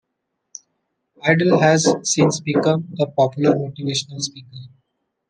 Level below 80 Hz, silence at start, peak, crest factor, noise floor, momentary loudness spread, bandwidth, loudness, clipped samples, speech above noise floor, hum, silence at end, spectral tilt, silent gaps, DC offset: -62 dBFS; 1.25 s; -2 dBFS; 18 dB; -76 dBFS; 11 LU; 10.5 kHz; -18 LUFS; under 0.1%; 58 dB; none; 0.6 s; -4.5 dB/octave; none; under 0.1%